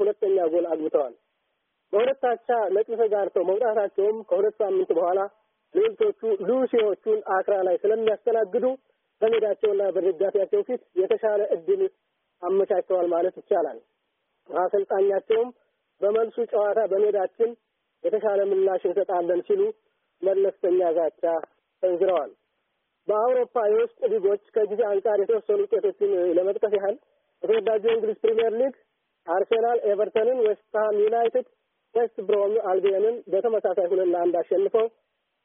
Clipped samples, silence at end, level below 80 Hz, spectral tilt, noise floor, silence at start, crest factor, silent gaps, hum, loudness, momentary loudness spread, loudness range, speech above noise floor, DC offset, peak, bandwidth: under 0.1%; 0.55 s; -78 dBFS; -1 dB/octave; -76 dBFS; 0 s; 14 dB; none; none; -24 LUFS; 5 LU; 2 LU; 53 dB; under 0.1%; -10 dBFS; 3.7 kHz